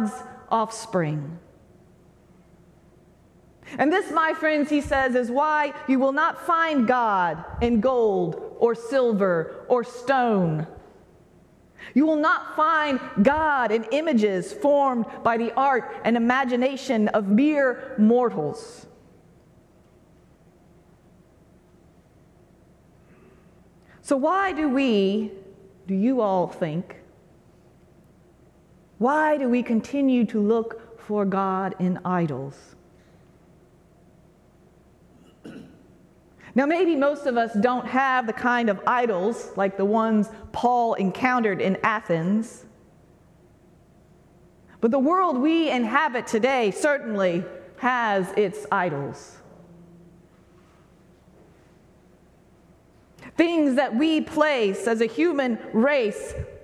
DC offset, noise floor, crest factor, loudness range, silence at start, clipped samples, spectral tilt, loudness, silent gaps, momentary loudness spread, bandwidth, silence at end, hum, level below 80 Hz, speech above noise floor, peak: under 0.1%; -55 dBFS; 18 dB; 8 LU; 0 s; under 0.1%; -6 dB/octave; -23 LUFS; none; 9 LU; 12.5 kHz; 0.05 s; none; -54 dBFS; 33 dB; -6 dBFS